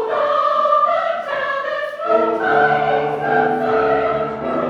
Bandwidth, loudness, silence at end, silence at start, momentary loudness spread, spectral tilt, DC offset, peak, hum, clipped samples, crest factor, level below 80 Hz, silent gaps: 7.4 kHz; -17 LUFS; 0 s; 0 s; 7 LU; -6.5 dB/octave; under 0.1%; -2 dBFS; none; under 0.1%; 16 dB; -52 dBFS; none